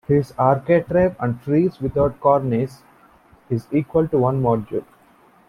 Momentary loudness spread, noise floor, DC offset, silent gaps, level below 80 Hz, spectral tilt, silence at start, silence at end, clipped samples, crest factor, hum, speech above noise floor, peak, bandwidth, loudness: 10 LU; -53 dBFS; under 0.1%; none; -46 dBFS; -10 dB/octave; 0.1 s; 0.65 s; under 0.1%; 18 dB; none; 34 dB; -2 dBFS; 12.5 kHz; -20 LUFS